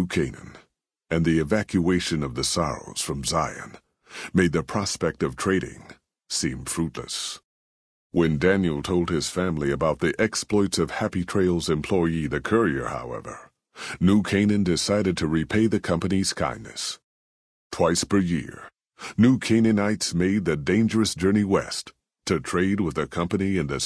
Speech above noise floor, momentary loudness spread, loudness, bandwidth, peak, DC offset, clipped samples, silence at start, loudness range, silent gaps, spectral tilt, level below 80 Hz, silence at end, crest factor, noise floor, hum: 40 dB; 12 LU; -24 LUFS; 11 kHz; -6 dBFS; under 0.1%; under 0.1%; 0 s; 4 LU; 7.44-8.10 s, 17.04-17.70 s; -5 dB/octave; -46 dBFS; 0 s; 18 dB; -64 dBFS; none